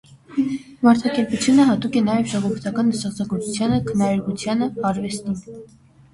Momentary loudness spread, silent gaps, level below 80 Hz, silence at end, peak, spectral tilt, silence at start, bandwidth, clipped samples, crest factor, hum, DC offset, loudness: 10 LU; none; -52 dBFS; 0.5 s; -2 dBFS; -5.5 dB/octave; 0.1 s; 11.5 kHz; under 0.1%; 18 dB; none; under 0.1%; -21 LUFS